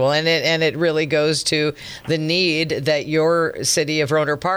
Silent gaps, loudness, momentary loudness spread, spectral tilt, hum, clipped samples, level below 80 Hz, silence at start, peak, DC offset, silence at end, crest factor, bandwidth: none; -18 LUFS; 4 LU; -3.5 dB/octave; none; under 0.1%; -54 dBFS; 0 s; -6 dBFS; under 0.1%; 0 s; 14 dB; over 20 kHz